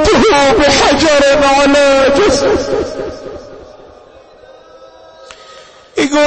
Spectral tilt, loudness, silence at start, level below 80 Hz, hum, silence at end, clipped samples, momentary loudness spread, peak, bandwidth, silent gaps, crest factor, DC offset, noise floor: -3.5 dB/octave; -9 LUFS; 0 s; -32 dBFS; none; 0 s; under 0.1%; 16 LU; 0 dBFS; 8.8 kHz; none; 12 dB; under 0.1%; -39 dBFS